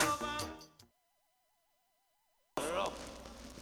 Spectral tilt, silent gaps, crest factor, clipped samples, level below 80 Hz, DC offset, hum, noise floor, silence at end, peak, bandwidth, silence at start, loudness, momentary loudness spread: -2.5 dB/octave; none; 24 dB; under 0.1%; -60 dBFS; under 0.1%; none; -78 dBFS; 0 s; -18 dBFS; over 20 kHz; 0 s; -39 LUFS; 16 LU